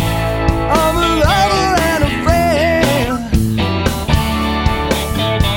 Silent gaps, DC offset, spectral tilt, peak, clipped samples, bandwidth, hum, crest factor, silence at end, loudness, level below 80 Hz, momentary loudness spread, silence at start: none; under 0.1%; -5 dB/octave; 0 dBFS; under 0.1%; 17 kHz; none; 14 dB; 0 s; -14 LUFS; -22 dBFS; 4 LU; 0 s